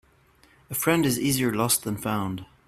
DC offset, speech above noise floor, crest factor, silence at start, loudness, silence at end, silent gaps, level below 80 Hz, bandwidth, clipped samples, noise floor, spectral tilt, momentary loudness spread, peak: under 0.1%; 34 dB; 20 dB; 0.7 s; -25 LUFS; 0.25 s; none; -56 dBFS; 16 kHz; under 0.1%; -59 dBFS; -4 dB/octave; 8 LU; -8 dBFS